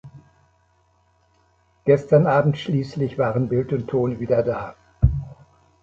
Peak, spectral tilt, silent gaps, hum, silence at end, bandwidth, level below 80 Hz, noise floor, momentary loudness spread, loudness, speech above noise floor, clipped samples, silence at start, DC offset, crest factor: -2 dBFS; -9 dB/octave; none; 50 Hz at -55 dBFS; 0.5 s; 7.4 kHz; -36 dBFS; -62 dBFS; 12 LU; -21 LUFS; 42 dB; under 0.1%; 0.05 s; under 0.1%; 20 dB